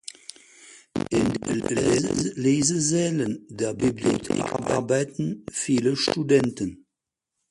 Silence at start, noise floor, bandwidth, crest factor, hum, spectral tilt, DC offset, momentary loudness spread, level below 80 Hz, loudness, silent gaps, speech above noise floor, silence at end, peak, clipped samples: 0.6 s; -85 dBFS; 11.5 kHz; 18 dB; none; -4.5 dB/octave; under 0.1%; 10 LU; -54 dBFS; -24 LUFS; none; 61 dB; 0.75 s; -6 dBFS; under 0.1%